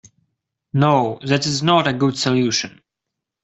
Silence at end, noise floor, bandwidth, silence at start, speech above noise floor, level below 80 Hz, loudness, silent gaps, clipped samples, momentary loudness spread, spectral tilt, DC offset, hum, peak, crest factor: 0.75 s; -82 dBFS; 8.2 kHz; 0.75 s; 65 dB; -56 dBFS; -18 LUFS; none; under 0.1%; 6 LU; -5 dB/octave; under 0.1%; none; -2 dBFS; 18 dB